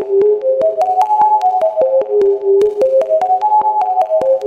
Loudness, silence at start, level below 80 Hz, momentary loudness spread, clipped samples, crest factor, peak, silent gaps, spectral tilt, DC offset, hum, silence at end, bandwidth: -13 LUFS; 0 s; -60 dBFS; 2 LU; under 0.1%; 10 dB; -2 dBFS; none; -6 dB/octave; under 0.1%; none; 0 s; 8.2 kHz